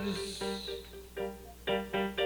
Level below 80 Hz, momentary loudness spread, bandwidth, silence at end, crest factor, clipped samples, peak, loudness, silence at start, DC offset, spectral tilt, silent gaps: -54 dBFS; 9 LU; over 20 kHz; 0 s; 18 dB; under 0.1%; -20 dBFS; -37 LUFS; 0 s; under 0.1%; -4 dB/octave; none